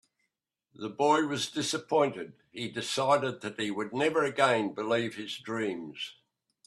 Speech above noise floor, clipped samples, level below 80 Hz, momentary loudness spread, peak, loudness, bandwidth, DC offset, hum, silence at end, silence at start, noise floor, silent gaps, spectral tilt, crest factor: 53 dB; under 0.1%; -74 dBFS; 14 LU; -8 dBFS; -30 LUFS; 13 kHz; under 0.1%; none; 0.55 s; 0.8 s; -83 dBFS; none; -4 dB/octave; 22 dB